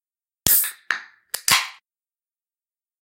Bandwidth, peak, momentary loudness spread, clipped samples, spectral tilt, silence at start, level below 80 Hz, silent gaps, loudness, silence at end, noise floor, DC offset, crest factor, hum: 17 kHz; 0 dBFS; 14 LU; under 0.1%; 0.5 dB/octave; 0.45 s; -52 dBFS; none; -20 LUFS; 1.3 s; under -90 dBFS; under 0.1%; 26 dB; none